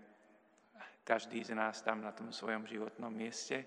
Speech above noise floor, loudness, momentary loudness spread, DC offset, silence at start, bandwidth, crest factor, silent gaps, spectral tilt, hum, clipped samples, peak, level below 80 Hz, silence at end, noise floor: 28 dB; -41 LUFS; 10 LU; under 0.1%; 0 s; 11 kHz; 26 dB; none; -3.5 dB/octave; none; under 0.1%; -16 dBFS; under -90 dBFS; 0 s; -68 dBFS